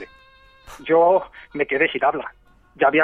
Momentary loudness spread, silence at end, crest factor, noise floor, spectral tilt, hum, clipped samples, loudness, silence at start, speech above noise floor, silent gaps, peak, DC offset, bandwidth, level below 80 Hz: 18 LU; 0 s; 18 dB; -51 dBFS; -6 dB/octave; none; under 0.1%; -20 LUFS; 0 s; 32 dB; none; -4 dBFS; under 0.1%; 10 kHz; -54 dBFS